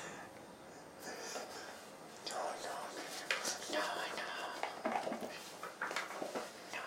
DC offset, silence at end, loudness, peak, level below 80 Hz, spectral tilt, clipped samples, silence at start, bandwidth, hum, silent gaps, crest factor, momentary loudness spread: under 0.1%; 0 s; -42 LUFS; -18 dBFS; -84 dBFS; -1.5 dB/octave; under 0.1%; 0 s; 16 kHz; none; none; 26 dB; 13 LU